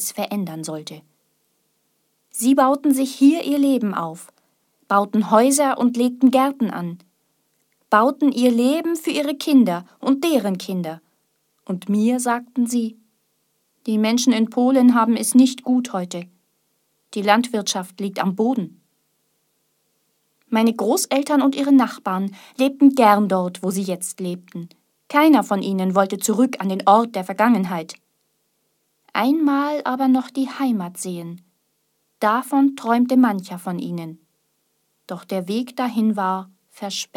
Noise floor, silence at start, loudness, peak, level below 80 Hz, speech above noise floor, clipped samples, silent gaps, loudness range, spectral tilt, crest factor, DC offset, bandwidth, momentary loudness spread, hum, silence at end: -69 dBFS; 0 s; -19 LUFS; 0 dBFS; -76 dBFS; 50 dB; under 0.1%; none; 5 LU; -5 dB/octave; 20 dB; under 0.1%; 17 kHz; 14 LU; none; 0.1 s